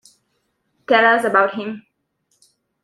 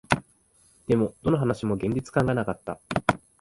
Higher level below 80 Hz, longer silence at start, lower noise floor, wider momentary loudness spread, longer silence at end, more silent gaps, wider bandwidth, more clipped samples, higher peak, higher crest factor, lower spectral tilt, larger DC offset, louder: second, -70 dBFS vs -50 dBFS; first, 0.9 s vs 0.1 s; first, -69 dBFS vs -61 dBFS; first, 17 LU vs 7 LU; first, 1.05 s vs 0.25 s; neither; first, 13.5 kHz vs 11.5 kHz; neither; about the same, 0 dBFS vs -2 dBFS; about the same, 20 dB vs 24 dB; second, -4.5 dB/octave vs -7 dB/octave; neither; first, -16 LUFS vs -26 LUFS